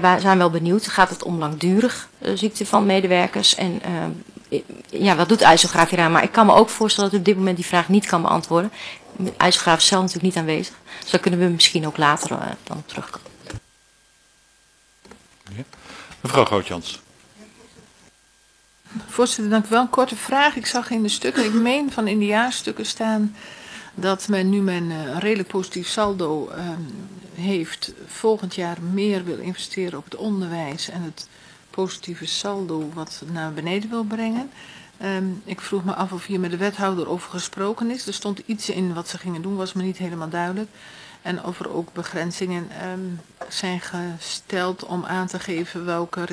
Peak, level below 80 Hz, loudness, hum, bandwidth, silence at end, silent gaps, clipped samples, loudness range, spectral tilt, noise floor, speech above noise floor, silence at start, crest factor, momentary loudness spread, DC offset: 0 dBFS; -58 dBFS; -21 LUFS; none; 11 kHz; 0 s; none; under 0.1%; 11 LU; -4 dB/octave; -57 dBFS; 36 dB; 0 s; 22 dB; 17 LU; under 0.1%